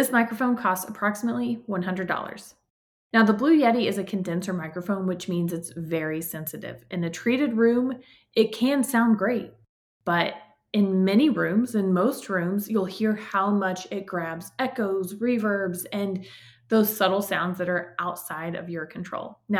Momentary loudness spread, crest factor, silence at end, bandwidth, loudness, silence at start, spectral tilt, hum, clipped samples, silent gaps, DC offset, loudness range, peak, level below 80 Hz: 12 LU; 18 dB; 0 s; 19 kHz; -25 LUFS; 0 s; -5.5 dB/octave; none; under 0.1%; 2.70-3.10 s, 9.69-10.00 s; under 0.1%; 3 LU; -8 dBFS; -68 dBFS